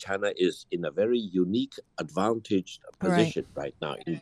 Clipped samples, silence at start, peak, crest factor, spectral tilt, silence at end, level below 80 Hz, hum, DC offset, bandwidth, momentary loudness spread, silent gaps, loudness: under 0.1%; 0 s; -8 dBFS; 20 dB; -6 dB/octave; 0 s; -64 dBFS; none; under 0.1%; 12 kHz; 10 LU; none; -29 LUFS